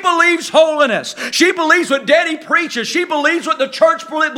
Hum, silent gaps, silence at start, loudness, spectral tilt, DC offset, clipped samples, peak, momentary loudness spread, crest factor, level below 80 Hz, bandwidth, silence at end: none; none; 0 s; -14 LUFS; -2 dB/octave; under 0.1%; under 0.1%; 0 dBFS; 6 LU; 14 dB; -68 dBFS; 16.5 kHz; 0 s